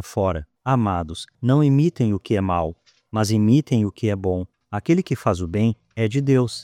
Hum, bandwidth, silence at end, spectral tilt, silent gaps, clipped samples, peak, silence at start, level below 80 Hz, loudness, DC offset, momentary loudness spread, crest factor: none; 14.5 kHz; 0 s; -7.5 dB/octave; none; under 0.1%; -6 dBFS; 0 s; -46 dBFS; -21 LUFS; under 0.1%; 11 LU; 16 dB